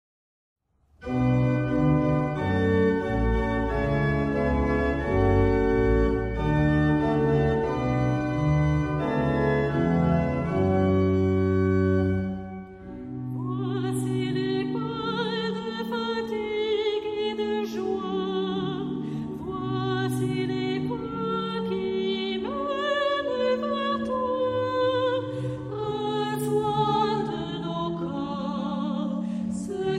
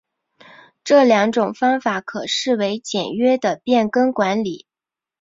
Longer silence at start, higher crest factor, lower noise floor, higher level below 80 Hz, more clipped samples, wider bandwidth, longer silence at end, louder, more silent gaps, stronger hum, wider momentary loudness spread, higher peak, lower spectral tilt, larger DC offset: first, 1 s vs 0.85 s; about the same, 16 dB vs 16 dB; second, -47 dBFS vs -89 dBFS; first, -38 dBFS vs -64 dBFS; neither; first, 14.5 kHz vs 7.8 kHz; second, 0 s vs 0.65 s; second, -26 LUFS vs -18 LUFS; neither; neither; about the same, 8 LU vs 9 LU; second, -10 dBFS vs -2 dBFS; first, -7.5 dB/octave vs -4.5 dB/octave; neither